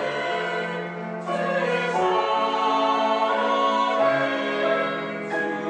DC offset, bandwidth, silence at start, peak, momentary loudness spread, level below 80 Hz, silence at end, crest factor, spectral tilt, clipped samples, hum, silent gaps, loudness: under 0.1%; 9.6 kHz; 0 s; -10 dBFS; 7 LU; -76 dBFS; 0 s; 14 dB; -5 dB/octave; under 0.1%; none; none; -23 LUFS